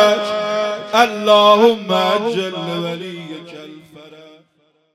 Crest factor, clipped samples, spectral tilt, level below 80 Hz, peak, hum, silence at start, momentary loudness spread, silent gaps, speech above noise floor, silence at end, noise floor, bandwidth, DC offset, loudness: 16 dB; under 0.1%; -4.5 dB/octave; -68 dBFS; 0 dBFS; none; 0 s; 21 LU; none; 46 dB; 0.85 s; -61 dBFS; 15.5 kHz; under 0.1%; -15 LUFS